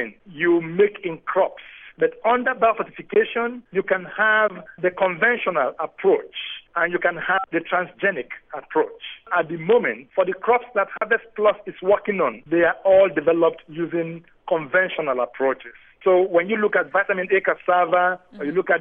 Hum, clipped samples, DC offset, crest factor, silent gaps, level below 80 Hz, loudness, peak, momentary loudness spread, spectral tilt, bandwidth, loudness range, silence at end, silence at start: none; under 0.1%; under 0.1%; 16 dB; none; -62 dBFS; -21 LUFS; -6 dBFS; 9 LU; -9 dB/octave; 3.8 kHz; 3 LU; 0 s; 0 s